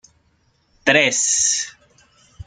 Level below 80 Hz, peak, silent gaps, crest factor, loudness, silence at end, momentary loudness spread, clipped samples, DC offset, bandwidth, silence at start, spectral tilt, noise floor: -56 dBFS; 0 dBFS; none; 22 dB; -16 LUFS; 0.05 s; 8 LU; under 0.1%; under 0.1%; 11 kHz; 0.85 s; -1 dB/octave; -62 dBFS